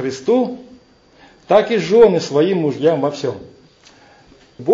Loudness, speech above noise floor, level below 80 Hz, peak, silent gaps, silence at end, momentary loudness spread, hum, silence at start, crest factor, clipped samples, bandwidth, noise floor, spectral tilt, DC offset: -16 LUFS; 34 dB; -56 dBFS; 0 dBFS; none; 0 s; 14 LU; none; 0 s; 16 dB; under 0.1%; 7.6 kHz; -49 dBFS; -6 dB/octave; under 0.1%